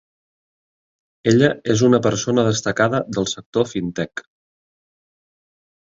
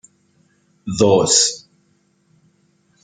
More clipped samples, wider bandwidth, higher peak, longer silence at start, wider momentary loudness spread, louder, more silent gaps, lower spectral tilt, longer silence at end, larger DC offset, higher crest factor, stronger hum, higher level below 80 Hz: neither; second, 8 kHz vs 10 kHz; about the same, -2 dBFS vs -2 dBFS; first, 1.25 s vs 0.85 s; second, 10 LU vs 23 LU; second, -19 LUFS vs -15 LUFS; first, 3.46-3.52 s vs none; first, -5 dB/octave vs -3 dB/octave; first, 1.65 s vs 1.45 s; neither; about the same, 20 dB vs 20 dB; neither; about the same, -54 dBFS vs -56 dBFS